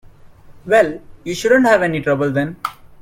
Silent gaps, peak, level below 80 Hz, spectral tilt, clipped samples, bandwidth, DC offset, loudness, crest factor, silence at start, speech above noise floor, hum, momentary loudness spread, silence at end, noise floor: none; 0 dBFS; -48 dBFS; -5.5 dB/octave; under 0.1%; 16.5 kHz; under 0.1%; -16 LUFS; 18 dB; 0.25 s; 26 dB; none; 15 LU; 0.3 s; -41 dBFS